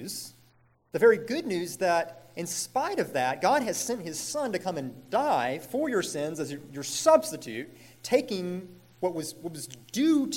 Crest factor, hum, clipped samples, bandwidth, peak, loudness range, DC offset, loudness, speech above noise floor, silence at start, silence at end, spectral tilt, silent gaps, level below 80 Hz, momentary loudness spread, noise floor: 20 dB; none; under 0.1%; 17 kHz; -8 dBFS; 3 LU; under 0.1%; -28 LUFS; 35 dB; 0 s; 0 s; -4 dB/octave; none; -72 dBFS; 16 LU; -63 dBFS